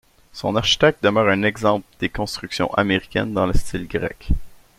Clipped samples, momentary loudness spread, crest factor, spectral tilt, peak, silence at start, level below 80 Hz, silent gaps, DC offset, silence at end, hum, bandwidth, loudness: under 0.1%; 11 LU; 18 dB; -5 dB/octave; -2 dBFS; 0.35 s; -32 dBFS; none; under 0.1%; 0.25 s; none; 15 kHz; -21 LUFS